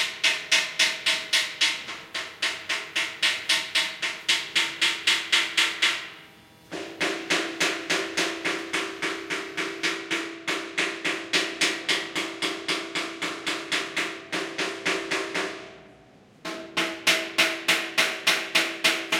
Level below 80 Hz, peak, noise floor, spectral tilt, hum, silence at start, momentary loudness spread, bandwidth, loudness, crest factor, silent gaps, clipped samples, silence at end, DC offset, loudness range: -72 dBFS; -6 dBFS; -53 dBFS; -0.5 dB/octave; none; 0 s; 9 LU; 16.5 kHz; -25 LUFS; 22 dB; none; under 0.1%; 0 s; under 0.1%; 5 LU